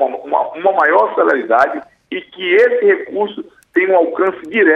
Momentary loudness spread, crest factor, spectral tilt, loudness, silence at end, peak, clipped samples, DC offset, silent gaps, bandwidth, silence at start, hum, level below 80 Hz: 14 LU; 14 dB; -5.5 dB/octave; -14 LUFS; 0 s; 0 dBFS; under 0.1%; under 0.1%; none; 6.6 kHz; 0 s; none; -64 dBFS